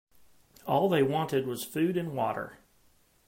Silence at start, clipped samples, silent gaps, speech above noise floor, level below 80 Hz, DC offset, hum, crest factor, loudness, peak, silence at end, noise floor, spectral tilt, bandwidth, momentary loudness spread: 0.65 s; under 0.1%; none; 37 dB; -70 dBFS; under 0.1%; none; 18 dB; -29 LUFS; -14 dBFS; 0.75 s; -65 dBFS; -6 dB/octave; 16.5 kHz; 12 LU